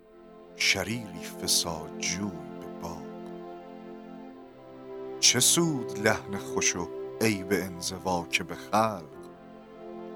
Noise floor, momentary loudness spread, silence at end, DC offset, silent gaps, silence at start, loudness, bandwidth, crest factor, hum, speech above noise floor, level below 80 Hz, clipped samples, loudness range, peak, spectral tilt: -51 dBFS; 23 LU; 0 s; under 0.1%; none; 0.1 s; -27 LUFS; 18 kHz; 24 dB; none; 22 dB; -62 dBFS; under 0.1%; 7 LU; -6 dBFS; -2.5 dB/octave